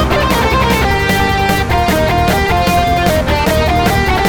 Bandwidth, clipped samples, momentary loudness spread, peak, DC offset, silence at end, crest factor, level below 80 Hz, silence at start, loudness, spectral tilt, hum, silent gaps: 19.5 kHz; under 0.1%; 1 LU; 0 dBFS; under 0.1%; 0 s; 12 dB; -20 dBFS; 0 s; -12 LUFS; -5 dB/octave; none; none